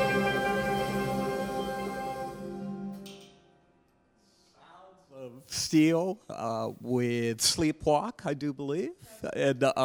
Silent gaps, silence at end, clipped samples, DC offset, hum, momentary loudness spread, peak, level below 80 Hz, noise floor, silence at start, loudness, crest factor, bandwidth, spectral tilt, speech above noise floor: none; 0 s; under 0.1%; under 0.1%; none; 15 LU; -12 dBFS; -58 dBFS; -67 dBFS; 0 s; -30 LUFS; 20 dB; over 20 kHz; -4.5 dB/octave; 38 dB